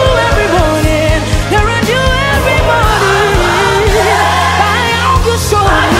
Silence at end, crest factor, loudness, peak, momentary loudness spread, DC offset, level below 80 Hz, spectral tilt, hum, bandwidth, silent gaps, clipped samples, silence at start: 0 s; 10 dB; -10 LUFS; 0 dBFS; 2 LU; under 0.1%; -18 dBFS; -4.5 dB/octave; none; 16.5 kHz; none; under 0.1%; 0 s